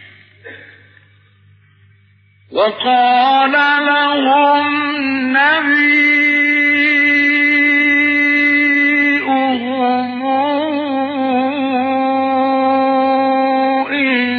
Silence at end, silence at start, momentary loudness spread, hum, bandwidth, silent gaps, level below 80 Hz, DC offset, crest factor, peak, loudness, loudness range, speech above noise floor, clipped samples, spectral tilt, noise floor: 0 s; 0.45 s; 6 LU; none; 6.4 kHz; none; -68 dBFS; under 0.1%; 12 dB; -2 dBFS; -12 LUFS; 6 LU; 38 dB; under 0.1%; -4.5 dB/octave; -51 dBFS